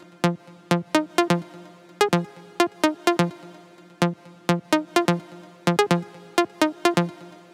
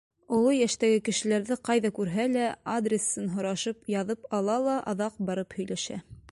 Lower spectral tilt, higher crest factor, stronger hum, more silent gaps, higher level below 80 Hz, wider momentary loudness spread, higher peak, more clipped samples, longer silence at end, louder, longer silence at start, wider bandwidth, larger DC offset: about the same, -5 dB/octave vs -4.5 dB/octave; about the same, 18 dB vs 16 dB; neither; neither; second, -72 dBFS vs -64 dBFS; about the same, 9 LU vs 8 LU; first, -6 dBFS vs -12 dBFS; neither; about the same, 0.2 s vs 0.15 s; first, -24 LUFS vs -28 LUFS; about the same, 0.25 s vs 0.3 s; first, 16.5 kHz vs 11.5 kHz; neither